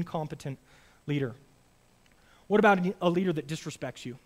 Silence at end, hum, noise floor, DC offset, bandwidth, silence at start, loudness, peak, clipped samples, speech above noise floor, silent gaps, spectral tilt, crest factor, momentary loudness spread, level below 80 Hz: 0.1 s; none; -63 dBFS; under 0.1%; 15 kHz; 0 s; -29 LUFS; -8 dBFS; under 0.1%; 34 dB; none; -6.5 dB/octave; 22 dB; 17 LU; -64 dBFS